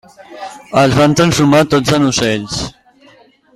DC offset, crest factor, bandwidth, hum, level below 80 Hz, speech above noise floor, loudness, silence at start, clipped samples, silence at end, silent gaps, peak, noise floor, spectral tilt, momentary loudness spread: under 0.1%; 14 dB; 15 kHz; none; -40 dBFS; 34 dB; -12 LUFS; 0.2 s; under 0.1%; 0.85 s; none; 0 dBFS; -46 dBFS; -5 dB/octave; 18 LU